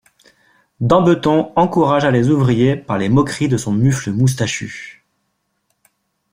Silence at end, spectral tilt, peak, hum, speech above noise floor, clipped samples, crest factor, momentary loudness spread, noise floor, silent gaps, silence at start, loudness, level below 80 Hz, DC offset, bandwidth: 1.4 s; -6.5 dB/octave; -2 dBFS; none; 54 dB; under 0.1%; 16 dB; 9 LU; -69 dBFS; none; 0.8 s; -15 LUFS; -48 dBFS; under 0.1%; 14.5 kHz